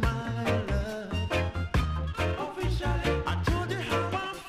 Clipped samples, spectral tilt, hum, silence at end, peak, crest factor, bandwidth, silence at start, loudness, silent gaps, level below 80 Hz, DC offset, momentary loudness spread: under 0.1%; -6 dB/octave; none; 0 s; -14 dBFS; 14 dB; 15 kHz; 0 s; -30 LUFS; none; -36 dBFS; under 0.1%; 3 LU